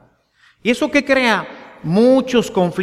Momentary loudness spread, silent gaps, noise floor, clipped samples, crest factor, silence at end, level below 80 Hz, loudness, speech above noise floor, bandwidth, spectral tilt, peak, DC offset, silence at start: 10 LU; none; -55 dBFS; under 0.1%; 16 dB; 0 s; -52 dBFS; -16 LUFS; 40 dB; 14.5 kHz; -5.5 dB/octave; -2 dBFS; under 0.1%; 0.65 s